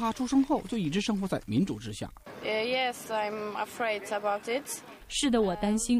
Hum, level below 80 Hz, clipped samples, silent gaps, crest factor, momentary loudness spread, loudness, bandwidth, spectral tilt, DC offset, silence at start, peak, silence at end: none; -52 dBFS; under 0.1%; none; 16 dB; 11 LU; -30 LUFS; 15.5 kHz; -4.5 dB/octave; under 0.1%; 0 s; -14 dBFS; 0 s